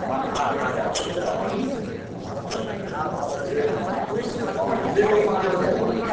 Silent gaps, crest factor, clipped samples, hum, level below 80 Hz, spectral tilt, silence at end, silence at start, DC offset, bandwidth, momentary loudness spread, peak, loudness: none; 18 dB; under 0.1%; none; -50 dBFS; -5.5 dB/octave; 0 s; 0 s; under 0.1%; 8 kHz; 9 LU; -8 dBFS; -24 LUFS